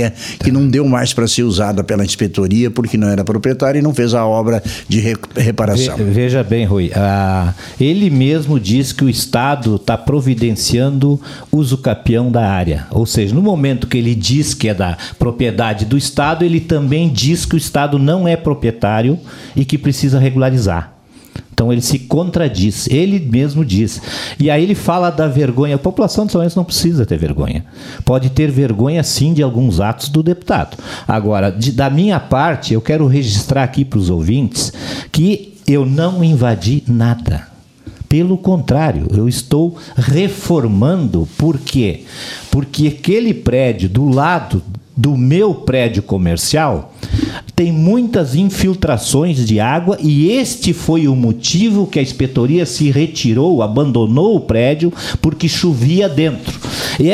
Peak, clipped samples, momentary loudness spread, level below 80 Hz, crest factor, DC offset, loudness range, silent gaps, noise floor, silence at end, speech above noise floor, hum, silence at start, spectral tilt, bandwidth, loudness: 0 dBFS; under 0.1%; 6 LU; -34 dBFS; 14 dB; under 0.1%; 2 LU; none; -36 dBFS; 0 s; 23 dB; none; 0 s; -6 dB/octave; 15 kHz; -14 LUFS